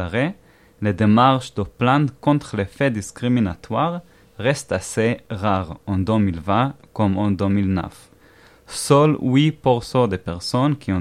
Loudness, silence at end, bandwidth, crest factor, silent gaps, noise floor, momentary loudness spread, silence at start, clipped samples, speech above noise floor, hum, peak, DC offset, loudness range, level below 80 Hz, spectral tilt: -20 LUFS; 0 s; 14.5 kHz; 18 dB; none; -50 dBFS; 10 LU; 0 s; under 0.1%; 31 dB; none; -2 dBFS; under 0.1%; 3 LU; -48 dBFS; -6.5 dB/octave